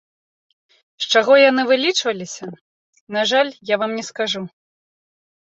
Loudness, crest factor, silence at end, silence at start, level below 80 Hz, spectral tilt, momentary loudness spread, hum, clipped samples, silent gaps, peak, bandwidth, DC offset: -18 LUFS; 18 dB; 0.95 s; 1 s; -70 dBFS; -2.5 dB/octave; 17 LU; none; under 0.1%; 2.61-2.93 s, 3.00-3.07 s; -2 dBFS; 8.2 kHz; under 0.1%